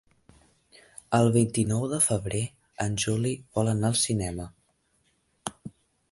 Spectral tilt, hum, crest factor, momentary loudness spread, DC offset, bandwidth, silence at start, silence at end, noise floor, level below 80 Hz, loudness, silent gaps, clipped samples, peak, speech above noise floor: -5 dB/octave; none; 20 dB; 16 LU; under 0.1%; 12 kHz; 1.1 s; 0.4 s; -70 dBFS; -52 dBFS; -26 LUFS; none; under 0.1%; -8 dBFS; 44 dB